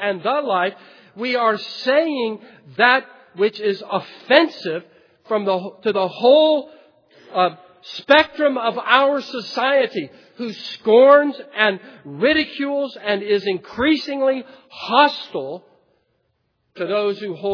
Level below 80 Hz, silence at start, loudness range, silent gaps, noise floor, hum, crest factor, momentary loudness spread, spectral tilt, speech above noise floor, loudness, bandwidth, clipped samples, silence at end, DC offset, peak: -62 dBFS; 0 s; 4 LU; none; -69 dBFS; none; 20 dB; 15 LU; -5.5 dB/octave; 50 dB; -18 LUFS; 5.4 kHz; under 0.1%; 0 s; under 0.1%; 0 dBFS